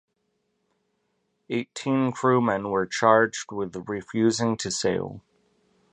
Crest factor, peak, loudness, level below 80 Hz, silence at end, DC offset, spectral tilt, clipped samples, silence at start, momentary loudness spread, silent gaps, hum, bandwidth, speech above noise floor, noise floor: 22 dB; -4 dBFS; -25 LUFS; -62 dBFS; 0.75 s; under 0.1%; -5 dB/octave; under 0.1%; 1.5 s; 12 LU; none; none; 10.5 kHz; 50 dB; -75 dBFS